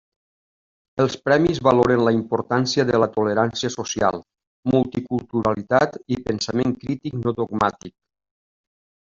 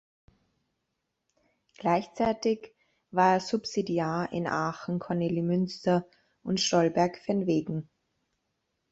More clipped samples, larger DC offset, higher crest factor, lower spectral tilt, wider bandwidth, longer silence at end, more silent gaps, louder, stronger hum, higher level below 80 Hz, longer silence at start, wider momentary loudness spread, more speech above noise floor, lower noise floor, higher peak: neither; neither; about the same, 18 dB vs 18 dB; about the same, -5.5 dB/octave vs -5.5 dB/octave; about the same, 7.6 kHz vs 8 kHz; first, 1.25 s vs 1.1 s; first, 4.47-4.63 s vs none; first, -21 LUFS vs -28 LUFS; neither; first, -52 dBFS vs -66 dBFS; second, 0.95 s vs 1.8 s; about the same, 9 LU vs 9 LU; first, over 69 dB vs 54 dB; first, under -90 dBFS vs -82 dBFS; first, -2 dBFS vs -10 dBFS